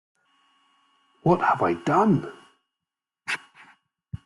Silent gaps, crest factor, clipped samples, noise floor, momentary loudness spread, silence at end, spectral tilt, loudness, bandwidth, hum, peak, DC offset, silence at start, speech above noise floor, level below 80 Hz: none; 20 dB; under 0.1%; -88 dBFS; 19 LU; 0.1 s; -7 dB/octave; -23 LUFS; 11.5 kHz; none; -6 dBFS; under 0.1%; 1.25 s; 67 dB; -62 dBFS